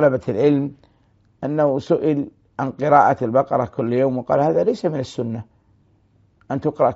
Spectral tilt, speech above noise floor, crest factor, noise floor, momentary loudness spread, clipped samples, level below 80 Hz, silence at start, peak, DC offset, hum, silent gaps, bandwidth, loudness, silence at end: -7 dB/octave; 40 dB; 20 dB; -58 dBFS; 12 LU; under 0.1%; -58 dBFS; 0 s; 0 dBFS; under 0.1%; none; none; 8 kHz; -20 LUFS; 0 s